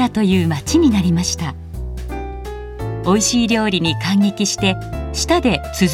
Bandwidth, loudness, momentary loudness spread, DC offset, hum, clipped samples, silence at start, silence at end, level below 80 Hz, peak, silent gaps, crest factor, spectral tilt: 15.5 kHz; -17 LUFS; 14 LU; under 0.1%; none; under 0.1%; 0 s; 0 s; -32 dBFS; -2 dBFS; none; 16 dB; -4.5 dB/octave